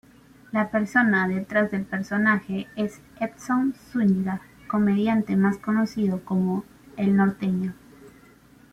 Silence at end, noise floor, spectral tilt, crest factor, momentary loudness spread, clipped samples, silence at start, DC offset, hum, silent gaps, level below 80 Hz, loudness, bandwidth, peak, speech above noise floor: 0.65 s; -53 dBFS; -7.5 dB/octave; 16 dB; 10 LU; under 0.1%; 0.55 s; under 0.1%; none; none; -58 dBFS; -24 LUFS; 11.5 kHz; -8 dBFS; 29 dB